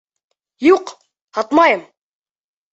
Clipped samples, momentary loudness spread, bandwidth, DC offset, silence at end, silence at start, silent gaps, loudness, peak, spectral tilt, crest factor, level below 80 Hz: under 0.1%; 13 LU; 8 kHz; under 0.1%; 0.9 s; 0.6 s; 1.22-1.28 s; -15 LUFS; -2 dBFS; -4 dB/octave; 18 dB; -62 dBFS